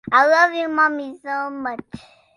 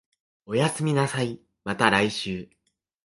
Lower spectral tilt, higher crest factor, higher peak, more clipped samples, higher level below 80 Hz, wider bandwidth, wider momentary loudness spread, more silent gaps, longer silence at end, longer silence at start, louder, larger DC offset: about the same, -4 dB/octave vs -5 dB/octave; second, 18 dB vs 24 dB; about the same, -2 dBFS vs -2 dBFS; neither; about the same, -60 dBFS vs -58 dBFS; about the same, 11.5 kHz vs 11.5 kHz; about the same, 15 LU vs 13 LU; neither; second, 0.4 s vs 0.6 s; second, 0.05 s vs 0.5 s; first, -19 LUFS vs -25 LUFS; neither